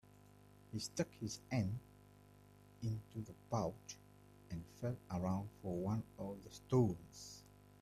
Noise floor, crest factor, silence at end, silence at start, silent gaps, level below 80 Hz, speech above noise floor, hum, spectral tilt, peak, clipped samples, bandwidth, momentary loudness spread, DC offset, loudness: -64 dBFS; 22 dB; 0.05 s; 0.7 s; none; -68 dBFS; 22 dB; 50 Hz at -60 dBFS; -6.5 dB/octave; -22 dBFS; under 0.1%; 14.5 kHz; 15 LU; under 0.1%; -43 LUFS